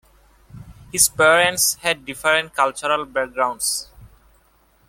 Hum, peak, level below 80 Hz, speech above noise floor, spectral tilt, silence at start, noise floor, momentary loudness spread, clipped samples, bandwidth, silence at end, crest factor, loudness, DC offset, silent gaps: none; -2 dBFS; -52 dBFS; 39 dB; -1 dB/octave; 0.55 s; -58 dBFS; 9 LU; under 0.1%; 17 kHz; 0.8 s; 20 dB; -18 LUFS; under 0.1%; none